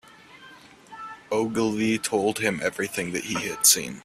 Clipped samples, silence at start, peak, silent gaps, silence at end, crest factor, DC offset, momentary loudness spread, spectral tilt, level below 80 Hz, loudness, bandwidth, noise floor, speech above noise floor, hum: under 0.1%; 0.35 s; -4 dBFS; none; 0.05 s; 22 dB; under 0.1%; 12 LU; -2.5 dB/octave; -62 dBFS; -23 LUFS; 15.5 kHz; -49 dBFS; 24 dB; none